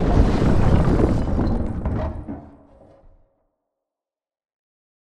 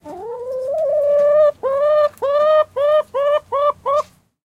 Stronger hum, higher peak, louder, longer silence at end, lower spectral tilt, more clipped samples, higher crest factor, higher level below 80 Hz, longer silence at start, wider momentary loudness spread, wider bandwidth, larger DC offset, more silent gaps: neither; first, -2 dBFS vs -6 dBFS; second, -21 LUFS vs -17 LUFS; first, 2.6 s vs 0.4 s; first, -8.5 dB/octave vs -4 dB/octave; neither; first, 18 dB vs 12 dB; first, -26 dBFS vs -60 dBFS; about the same, 0 s vs 0.05 s; first, 15 LU vs 11 LU; first, 9.6 kHz vs 8 kHz; neither; neither